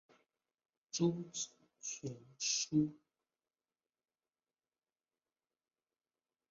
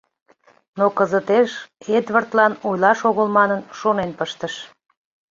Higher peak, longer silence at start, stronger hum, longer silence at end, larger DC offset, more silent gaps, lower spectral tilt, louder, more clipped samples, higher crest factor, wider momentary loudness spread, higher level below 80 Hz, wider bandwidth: second, -20 dBFS vs -2 dBFS; first, 0.95 s vs 0.75 s; neither; first, 3.55 s vs 0.65 s; neither; neither; about the same, -5.5 dB/octave vs -5.5 dB/octave; second, -39 LUFS vs -19 LUFS; neither; about the same, 22 dB vs 18 dB; about the same, 12 LU vs 12 LU; second, -80 dBFS vs -62 dBFS; about the same, 7.4 kHz vs 7.6 kHz